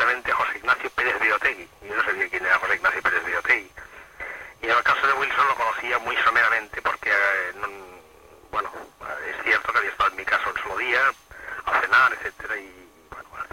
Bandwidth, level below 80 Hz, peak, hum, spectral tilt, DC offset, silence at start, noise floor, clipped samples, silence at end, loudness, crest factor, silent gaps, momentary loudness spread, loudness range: 16.5 kHz; -56 dBFS; -6 dBFS; none; -2.5 dB/octave; under 0.1%; 0 s; -50 dBFS; under 0.1%; 0.05 s; -22 LUFS; 18 dB; none; 16 LU; 4 LU